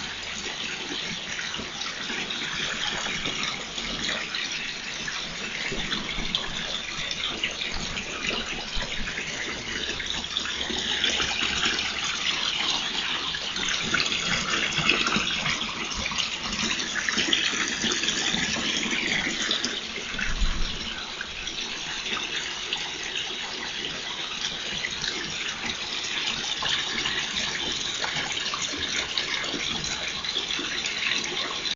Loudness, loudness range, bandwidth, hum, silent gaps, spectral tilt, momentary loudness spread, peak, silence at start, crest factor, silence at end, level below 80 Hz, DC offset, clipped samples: -26 LUFS; 5 LU; 8 kHz; none; none; -1 dB/octave; 7 LU; -4 dBFS; 0 s; 24 dB; 0 s; -42 dBFS; under 0.1%; under 0.1%